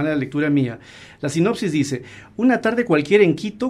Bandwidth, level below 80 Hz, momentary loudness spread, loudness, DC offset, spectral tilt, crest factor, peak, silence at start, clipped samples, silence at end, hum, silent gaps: 12.5 kHz; -58 dBFS; 13 LU; -19 LUFS; under 0.1%; -6.5 dB/octave; 16 dB; -2 dBFS; 0 s; under 0.1%; 0 s; none; none